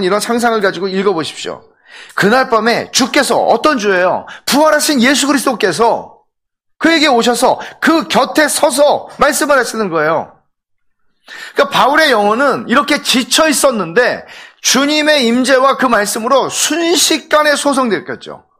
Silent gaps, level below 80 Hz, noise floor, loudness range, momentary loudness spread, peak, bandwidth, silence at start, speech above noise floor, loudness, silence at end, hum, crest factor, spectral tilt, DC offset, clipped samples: none; -52 dBFS; -67 dBFS; 2 LU; 7 LU; 0 dBFS; 16 kHz; 0 s; 55 dB; -12 LUFS; 0.25 s; none; 12 dB; -2.5 dB/octave; under 0.1%; under 0.1%